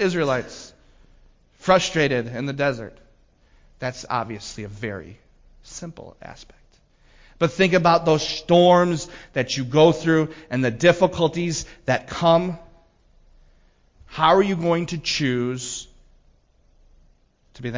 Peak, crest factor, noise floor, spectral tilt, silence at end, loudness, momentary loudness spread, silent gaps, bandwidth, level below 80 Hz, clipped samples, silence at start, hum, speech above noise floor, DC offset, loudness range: -4 dBFS; 18 dB; -58 dBFS; -5 dB/octave; 0 s; -21 LUFS; 20 LU; none; 7.6 kHz; -50 dBFS; under 0.1%; 0 s; none; 38 dB; under 0.1%; 14 LU